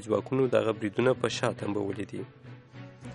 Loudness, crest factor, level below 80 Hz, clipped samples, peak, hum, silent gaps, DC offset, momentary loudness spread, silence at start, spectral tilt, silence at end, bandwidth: -29 LUFS; 20 dB; -66 dBFS; under 0.1%; -10 dBFS; none; none; under 0.1%; 21 LU; 0 s; -6 dB/octave; 0 s; 11.5 kHz